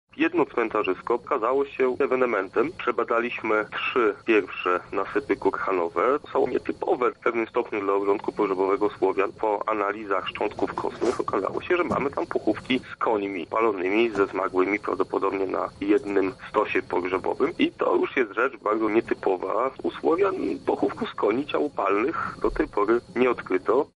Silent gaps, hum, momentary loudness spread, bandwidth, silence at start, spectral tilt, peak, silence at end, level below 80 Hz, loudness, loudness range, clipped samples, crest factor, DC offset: none; none; 4 LU; 10.5 kHz; 0.15 s; -6 dB/octave; -8 dBFS; 0.1 s; -54 dBFS; -25 LUFS; 1 LU; under 0.1%; 16 dB; under 0.1%